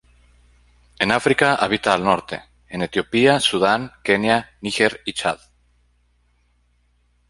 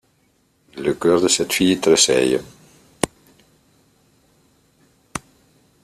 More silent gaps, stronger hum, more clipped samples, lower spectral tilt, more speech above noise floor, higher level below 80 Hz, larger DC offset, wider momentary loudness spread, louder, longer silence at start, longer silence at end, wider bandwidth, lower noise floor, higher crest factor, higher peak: neither; first, 60 Hz at -50 dBFS vs none; neither; about the same, -4 dB/octave vs -3 dB/octave; about the same, 43 dB vs 45 dB; about the same, -54 dBFS vs -54 dBFS; neither; second, 11 LU vs 19 LU; about the same, -19 LUFS vs -18 LUFS; first, 1 s vs 0.75 s; first, 1.95 s vs 0.65 s; second, 11.5 kHz vs 14.5 kHz; about the same, -62 dBFS vs -62 dBFS; about the same, 20 dB vs 22 dB; about the same, -2 dBFS vs 0 dBFS